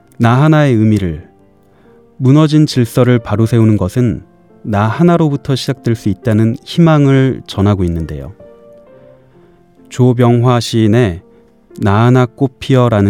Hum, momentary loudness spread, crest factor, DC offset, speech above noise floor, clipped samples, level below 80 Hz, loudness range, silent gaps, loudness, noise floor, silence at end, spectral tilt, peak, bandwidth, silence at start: none; 10 LU; 12 dB; 0.2%; 37 dB; under 0.1%; -42 dBFS; 3 LU; none; -12 LUFS; -47 dBFS; 0 s; -7.5 dB/octave; 0 dBFS; 14 kHz; 0.2 s